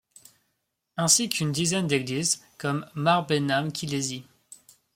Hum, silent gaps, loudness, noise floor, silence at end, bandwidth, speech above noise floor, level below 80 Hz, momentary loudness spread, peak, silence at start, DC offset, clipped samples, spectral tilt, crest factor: none; none; -25 LUFS; -78 dBFS; 0.4 s; 16.5 kHz; 52 dB; -66 dBFS; 10 LU; -4 dBFS; 0.95 s; under 0.1%; under 0.1%; -3.5 dB/octave; 24 dB